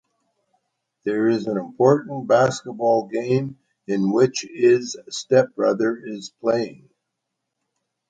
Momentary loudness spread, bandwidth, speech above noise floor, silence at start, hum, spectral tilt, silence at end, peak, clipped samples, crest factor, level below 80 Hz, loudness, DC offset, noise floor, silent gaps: 13 LU; 9.2 kHz; 59 dB; 1.05 s; none; -6 dB/octave; 1.35 s; -2 dBFS; under 0.1%; 18 dB; -68 dBFS; -21 LUFS; under 0.1%; -80 dBFS; none